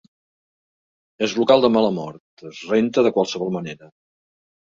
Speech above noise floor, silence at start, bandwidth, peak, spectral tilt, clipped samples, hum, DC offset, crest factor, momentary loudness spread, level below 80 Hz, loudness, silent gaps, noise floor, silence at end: over 71 dB; 1.2 s; 7.6 kHz; -2 dBFS; -5.5 dB/octave; under 0.1%; none; under 0.1%; 20 dB; 21 LU; -62 dBFS; -19 LUFS; 2.20-2.37 s; under -90 dBFS; 1.05 s